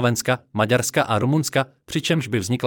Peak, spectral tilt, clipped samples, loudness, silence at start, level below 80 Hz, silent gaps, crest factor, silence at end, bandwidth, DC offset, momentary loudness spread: -6 dBFS; -4.5 dB/octave; under 0.1%; -21 LUFS; 0 s; -58 dBFS; none; 16 dB; 0 s; 18.5 kHz; under 0.1%; 5 LU